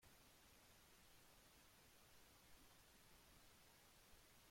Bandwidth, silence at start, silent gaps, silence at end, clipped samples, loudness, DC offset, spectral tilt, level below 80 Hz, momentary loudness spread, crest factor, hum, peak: 16.5 kHz; 0 s; none; 0 s; under 0.1%; -69 LUFS; under 0.1%; -2.5 dB/octave; -78 dBFS; 0 LU; 14 dB; none; -56 dBFS